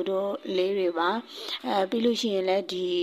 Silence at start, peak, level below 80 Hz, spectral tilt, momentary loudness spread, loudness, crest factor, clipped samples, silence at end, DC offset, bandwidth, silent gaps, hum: 0 s; -12 dBFS; -72 dBFS; -4.5 dB/octave; 6 LU; -27 LUFS; 14 dB; under 0.1%; 0 s; under 0.1%; 15 kHz; none; none